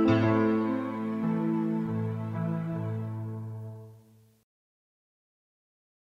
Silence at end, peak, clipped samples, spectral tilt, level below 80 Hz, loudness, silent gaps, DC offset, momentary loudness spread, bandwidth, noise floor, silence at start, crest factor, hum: 2.15 s; -12 dBFS; under 0.1%; -9.5 dB/octave; -64 dBFS; -30 LUFS; none; under 0.1%; 15 LU; 6.8 kHz; -58 dBFS; 0 s; 18 dB; none